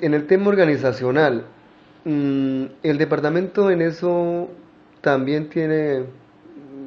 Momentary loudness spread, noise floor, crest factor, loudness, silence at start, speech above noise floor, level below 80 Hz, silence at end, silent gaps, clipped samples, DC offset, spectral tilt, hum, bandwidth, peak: 10 LU; -43 dBFS; 18 dB; -20 LUFS; 0 s; 24 dB; -62 dBFS; 0 s; none; under 0.1%; under 0.1%; -8.5 dB/octave; none; 6.8 kHz; -4 dBFS